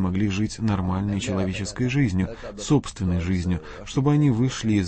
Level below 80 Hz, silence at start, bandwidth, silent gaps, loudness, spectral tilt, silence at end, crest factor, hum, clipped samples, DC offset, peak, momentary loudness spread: -42 dBFS; 0 s; 8.8 kHz; none; -24 LUFS; -6.5 dB/octave; 0 s; 14 dB; none; under 0.1%; under 0.1%; -8 dBFS; 8 LU